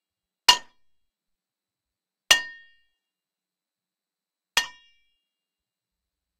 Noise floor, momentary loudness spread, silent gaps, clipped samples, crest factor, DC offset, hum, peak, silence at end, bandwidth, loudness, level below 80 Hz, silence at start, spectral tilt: under -90 dBFS; 13 LU; none; under 0.1%; 30 dB; under 0.1%; none; 0 dBFS; 1.7 s; 15.5 kHz; -21 LUFS; -64 dBFS; 0.5 s; 2.5 dB/octave